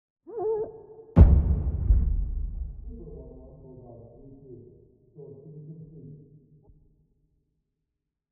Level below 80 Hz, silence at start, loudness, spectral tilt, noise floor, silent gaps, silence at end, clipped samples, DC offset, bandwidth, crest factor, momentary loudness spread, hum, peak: -30 dBFS; 0.3 s; -25 LUFS; -12 dB/octave; -84 dBFS; none; 2.15 s; under 0.1%; under 0.1%; 2.8 kHz; 26 dB; 29 LU; none; -2 dBFS